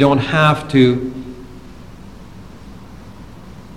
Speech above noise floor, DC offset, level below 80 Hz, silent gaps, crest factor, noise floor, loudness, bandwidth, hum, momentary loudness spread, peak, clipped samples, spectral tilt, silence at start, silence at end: 23 dB; 0.7%; -42 dBFS; none; 18 dB; -37 dBFS; -14 LUFS; 12.5 kHz; none; 25 LU; 0 dBFS; under 0.1%; -7 dB/octave; 0 s; 0 s